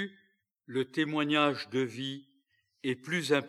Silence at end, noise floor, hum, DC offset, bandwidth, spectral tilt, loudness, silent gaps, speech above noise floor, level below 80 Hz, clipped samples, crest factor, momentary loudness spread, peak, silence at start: 0 s; -74 dBFS; none; under 0.1%; 13 kHz; -5 dB/octave; -32 LUFS; none; 43 dB; under -90 dBFS; under 0.1%; 22 dB; 12 LU; -10 dBFS; 0 s